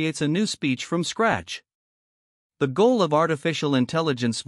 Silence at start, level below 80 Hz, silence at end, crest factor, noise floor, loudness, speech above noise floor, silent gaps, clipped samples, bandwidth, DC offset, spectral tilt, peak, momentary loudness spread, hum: 0 s; -62 dBFS; 0.05 s; 18 dB; under -90 dBFS; -23 LUFS; over 67 dB; 1.75-2.50 s; under 0.1%; 12 kHz; under 0.1%; -5 dB/octave; -6 dBFS; 8 LU; none